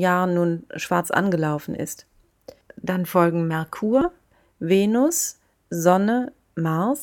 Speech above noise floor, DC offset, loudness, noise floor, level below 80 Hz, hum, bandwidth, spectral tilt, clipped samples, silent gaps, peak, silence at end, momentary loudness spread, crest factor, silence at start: 27 dB; under 0.1%; -22 LUFS; -48 dBFS; -58 dBFS; none; 18 kHz; -5.5 dB/octave; under 0.1%; none; -4 dBFS; 0 s; 12 LU; 18 dB; 0 s